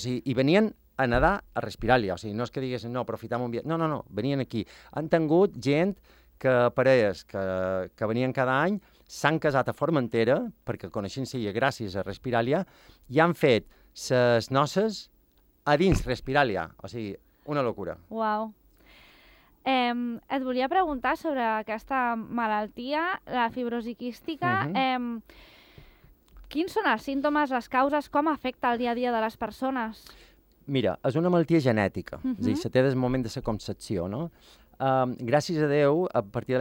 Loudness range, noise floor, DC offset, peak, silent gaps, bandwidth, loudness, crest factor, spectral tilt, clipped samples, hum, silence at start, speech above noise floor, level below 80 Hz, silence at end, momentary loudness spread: 4 LU; -63 dBFS; under 0.1%; -6 dBFS; none; 16.5 kHz; -27 LUFS; 20 dB; -6.5 dB/octave; under 0.1%; none; 0 s; 37 dB; -50 dBFS; 0 s; 11 LU